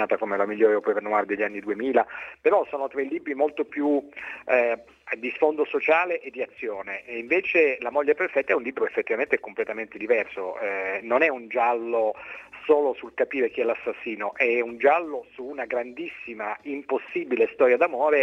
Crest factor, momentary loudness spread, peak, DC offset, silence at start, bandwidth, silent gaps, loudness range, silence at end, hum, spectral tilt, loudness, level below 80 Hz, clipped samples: 20 dB; 12 LU; -6 dBFS; under 0.1%; 0 s; 6.2 kHz; none; 2 LU; 0 s; none; -6 dB/octave; -25 LUFS; -70 dBFS; under 0.1%